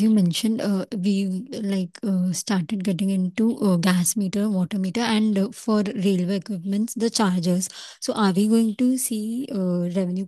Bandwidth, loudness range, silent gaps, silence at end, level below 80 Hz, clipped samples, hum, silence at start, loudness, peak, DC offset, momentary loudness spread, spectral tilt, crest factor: 12.5 kHz; 1 LU; none; 0 s; -68 dBFS; under 0.1%; none; 0 s; -23 LUFS; -6 dBFS; under 0.1%; 7 LU; -5.5 dB/octave; 16 dB